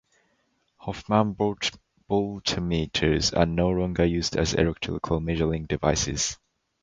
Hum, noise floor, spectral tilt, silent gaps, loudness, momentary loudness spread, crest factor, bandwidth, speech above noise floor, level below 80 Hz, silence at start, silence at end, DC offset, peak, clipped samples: none; -70 dBFS; -4.5 dB/octave; none; -25 LUFS; 7 LU; 22 dB; 9.4 kHz; 46 dB; -40 dBFS; 0.8 s; 0.5 s; under 0.1%; -4 dBFS; under 0.1%